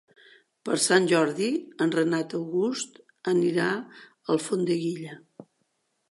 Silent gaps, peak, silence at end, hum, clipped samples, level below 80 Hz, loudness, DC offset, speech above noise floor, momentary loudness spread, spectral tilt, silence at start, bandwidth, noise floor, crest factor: none; -4 dBFS; 0.7 s; none; under 0.1%; -80 dBFS; -26 LUFS; under 0.1%; 49 dB; 17 LU; -4.5 dB/octave; 0.65 s; 11.5 kHz; -74 dBFS; 22 dB